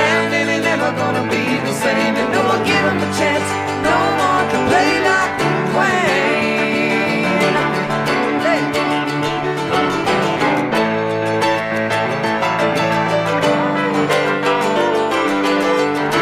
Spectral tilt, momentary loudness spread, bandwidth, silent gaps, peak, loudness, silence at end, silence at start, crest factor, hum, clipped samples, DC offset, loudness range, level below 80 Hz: -4.5 dB/octave; 3 LU; 16 kHz; none; -4 dBFS; -16 LUFS; 0 s; 0 s; 12 dB; none; under 0.1%; under 0.1%; 2 LU; -50 dBFS